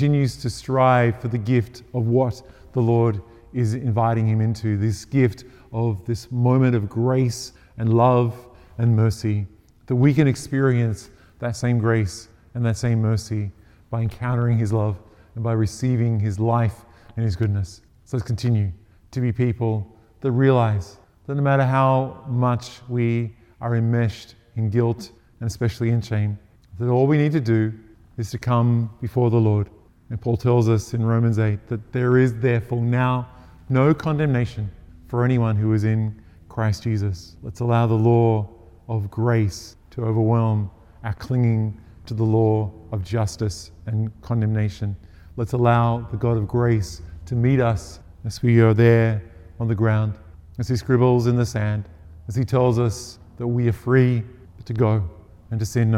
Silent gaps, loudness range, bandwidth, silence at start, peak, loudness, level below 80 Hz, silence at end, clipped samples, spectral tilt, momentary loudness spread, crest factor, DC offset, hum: none; 3 LU; 11 kHz; 0 s; -2 dBFS; -22 LUFS; -48 dBFS; 0 s; under 0.1%; -8 dB/octave; 15 LU; 18 dB; under 0.1%; none